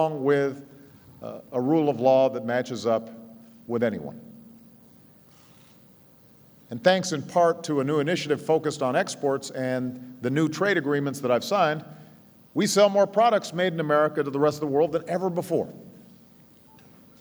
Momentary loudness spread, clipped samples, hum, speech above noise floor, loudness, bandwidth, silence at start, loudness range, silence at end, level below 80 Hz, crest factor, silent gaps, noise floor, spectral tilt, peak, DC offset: 16 LU; under 0.1%; none; 30 dB; -24 LUFS; over 20 kHz; 0 s; 8 LU; 1.3 s; -72 dBFS; 20 dB; none; -54 dBFS; -5 dB/octave; -6 dBFS; under 0.1%